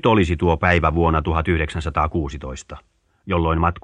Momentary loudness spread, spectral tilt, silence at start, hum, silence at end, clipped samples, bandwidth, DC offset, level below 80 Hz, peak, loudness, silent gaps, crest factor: 15 LU; -7 dB/octave; 0.05 s; none; 0.05 s; under 0.1%; 9.4 kHz; under 0.1%; -30 dBFS; 0 dBFS; -20 LUFS; none; 18 dB